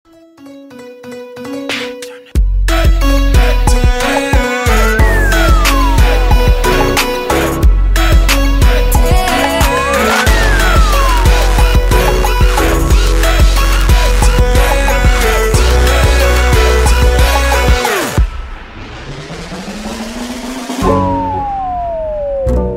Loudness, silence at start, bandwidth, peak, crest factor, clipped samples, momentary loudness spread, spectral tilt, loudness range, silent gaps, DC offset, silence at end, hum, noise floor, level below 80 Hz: -12 LUFS; 0.4 s; 16.5 kHz; 0 dBFS; 10 dB; under 0.1%; 13 LU; -4.5 dB/octave; 7 LU; none; under 0.1%; 0 s; none; -36 dBFS; -12 dBFS